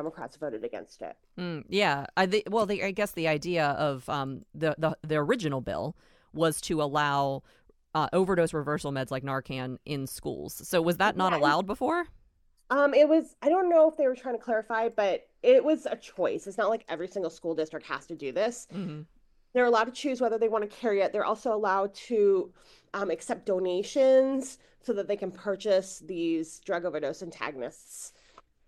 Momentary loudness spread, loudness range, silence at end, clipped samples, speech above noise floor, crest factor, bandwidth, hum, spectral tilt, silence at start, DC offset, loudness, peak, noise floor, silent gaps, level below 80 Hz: 14 LU; 6 LU; 0.6 s; under 0.1%; 36 dB; 18 dB; 16 kHz; none; -5 dB/octave; 0 s; under 0.1%; -28 LUFS; -10 dBFS; -64 dBFS; none; -62 dBFS